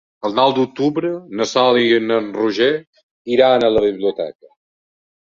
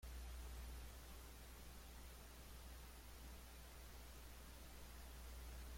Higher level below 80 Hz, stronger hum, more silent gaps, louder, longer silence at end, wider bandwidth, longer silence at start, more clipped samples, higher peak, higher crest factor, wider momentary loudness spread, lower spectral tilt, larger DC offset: about the same, -54 dBFS vs -58 dBFS; neither; first, 2.87-2.93 s, 3.03-3.25 s vs none; first, -17 LUFS vs -58 LUFS; first, 0.95 s vs 0 s; second, 7.6 kHz vs 16.5 kHz; first, 0.25 s vs 0 s; neither; first, -2 dBFS vs -44 dBFS; about the same, 16 dB vs 12 dB; first, 10 LU vs 4 LU; about the same, -5 dB/octave vs -4 dB/octave; neither